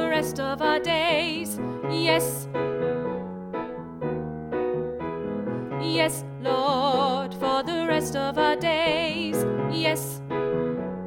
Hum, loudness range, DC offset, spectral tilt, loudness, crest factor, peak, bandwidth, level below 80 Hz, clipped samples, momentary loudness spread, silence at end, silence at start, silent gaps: none; 5 LU; under 0.1%; -4.5 dB/octave; -26 LUFS; 16 dB; -10 dBFS; 19 kHz; -54 dBFS; under 0.1%; 9 LU; 0 s; 0 s; none